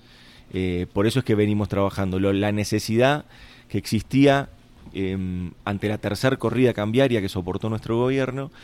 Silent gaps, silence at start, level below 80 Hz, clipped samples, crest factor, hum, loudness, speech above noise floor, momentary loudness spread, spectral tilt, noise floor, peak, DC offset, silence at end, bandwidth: none; 0.55 s; -48 dBFS; under 0.1%; 18 dB; none; -23 LUFS; 27 dB; 10 LU; -6.5 dB/octave; -49 dBFS; -4 dBFS; under 0.1%; 0 s; 16 kHz